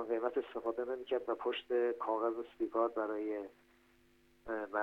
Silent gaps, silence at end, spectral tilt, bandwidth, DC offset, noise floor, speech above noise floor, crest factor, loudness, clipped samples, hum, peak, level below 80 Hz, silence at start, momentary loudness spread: none; 0 s; -5.5 dB/octave; 5.4 kHz; under 0.1%; -68 dBFS; 31 dB; 16 dB; -38 LUFS; under 0.1%; none; -22 dBFS; -74 dBFS; 0 s; 8 LU